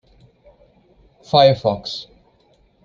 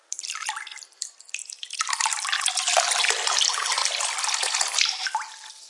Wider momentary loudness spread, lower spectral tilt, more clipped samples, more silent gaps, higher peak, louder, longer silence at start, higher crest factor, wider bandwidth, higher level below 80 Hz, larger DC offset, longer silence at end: about the same, 16 LU vs 14 LU; first, -6 dB/octave vs 7 dB/octave; neither; neither; about the same, -2 dBFS vs -2 dBFS; first, -17 LUFS vs -23 LUFS; first, 1.35 s vs 0.1 s; about the same, 20 dB vs 24 dB; second, 7.4 kHz vs 11.5 kHz; first, -54 dBFS vs under -90 dBFS; neither; first, 0.8 s vs 0 s